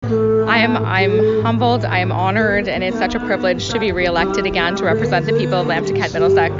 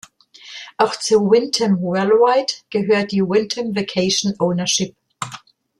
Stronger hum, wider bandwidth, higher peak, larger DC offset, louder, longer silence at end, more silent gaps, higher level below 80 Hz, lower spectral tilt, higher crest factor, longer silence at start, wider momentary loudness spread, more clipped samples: neither; second, 7.6 kHz vs 12.5 kHz; about the same, -2 dBFS vs -2 dBFS; neither; about the same, -16 LUFS vs -18 LUFS; second, 0 s vs 0.4 s; neither; first, -40 dBFS vs -60 dBFS; first, -6 dB/octave vs -4 dB/octave; about the same, 14 dB vs 16 dB; second, 0 s vs 0.45 s; second, 4 LU vs 16 LU; neither